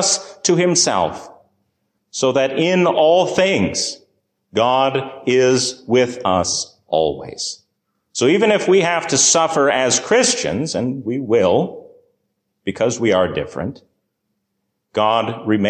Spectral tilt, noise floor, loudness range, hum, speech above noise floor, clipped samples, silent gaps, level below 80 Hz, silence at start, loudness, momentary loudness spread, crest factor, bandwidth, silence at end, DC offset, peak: -3.5 dB/octave; -73 dBFS; 5 LU; none; 57 dB; under 0.1%; none; -50 dBFS; 0 s; -17 LUFS; 12 LU; 14 dB; 10 kHz; 0 s; under 0.1%; -4 dBFS